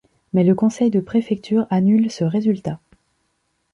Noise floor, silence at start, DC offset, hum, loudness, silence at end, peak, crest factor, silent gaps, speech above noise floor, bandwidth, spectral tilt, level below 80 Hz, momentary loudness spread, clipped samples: -69 dBFS; 0.35 s; under 0.1%; none; -19 LUFS; 1 s; -6 dBFS; 14 dB; none; 52 dB; 8.2 kHz; -8 dB/octave; -58 dBFS; 7 LU; under 0.1%